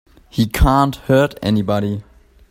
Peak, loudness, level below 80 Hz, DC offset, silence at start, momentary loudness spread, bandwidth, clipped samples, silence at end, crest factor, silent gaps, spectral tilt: 0 dBFS; -17 LUFS; -26 dBFS; under 0.1%; 0.35 s; 10 LU; 16.5 kHz; under 0.1%; 0.5 s; 16 dB; none; -6.5 dB/octave